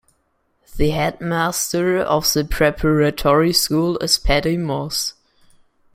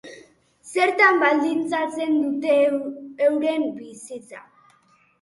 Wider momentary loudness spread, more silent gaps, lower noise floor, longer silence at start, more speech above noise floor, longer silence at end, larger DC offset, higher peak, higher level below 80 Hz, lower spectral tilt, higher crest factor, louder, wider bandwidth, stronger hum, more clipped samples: second, 6 LU vs 21 LU; neither; first, -66 dBFS vs -60 dBFS; first, 0.7 s vs 0.05 s; first, 48 dB vs 39 dB; about the same, 0.85 s vs 0.8 s; neither; about the same, -2 dBFS vs -4 dBFS; first, -32 dBFS vs -72 dBFS; about the same, -4 dB/octave vs -3.5 dB/octave; about the same, 18 dB vs 20 dB; first, -18 LUFS vs -21 LUFS; first, 16.5 kHz vs 11.5 kHz; neither; neither